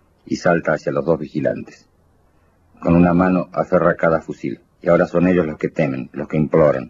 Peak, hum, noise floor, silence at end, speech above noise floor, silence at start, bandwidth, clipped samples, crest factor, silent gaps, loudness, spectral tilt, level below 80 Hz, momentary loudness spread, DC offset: -2 dBFS; none; -56 dBFS; 0 s; 39 dB; 0.3 s; 7.6 kHz; under 0.1%; 16 dB; none; -18 LUFS; -8.5 dB/octave; -46 dBFS; 11 LU; under 0.1%